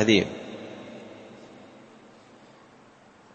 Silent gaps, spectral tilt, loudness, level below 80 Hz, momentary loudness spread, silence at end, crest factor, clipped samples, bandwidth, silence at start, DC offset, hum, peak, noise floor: none; -4.5 dB/octave; -28 LUFS; -66 dBFS; 26 LU; 1.85 s; 24 dB; under 0.1%; 8.8 kHz; 0 s; under 0.1%; none; -6 dBFS; -54 dBFS